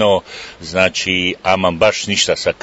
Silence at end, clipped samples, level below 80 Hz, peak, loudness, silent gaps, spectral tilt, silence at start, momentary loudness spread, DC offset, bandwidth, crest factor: 0.1 s; under 0.1%; -50 dBFS; 0 dBFS; -15 LUFS; none; -3 dB/octave; 0 s; 8 LU; under 0.1%; 8 kHz; 16 dB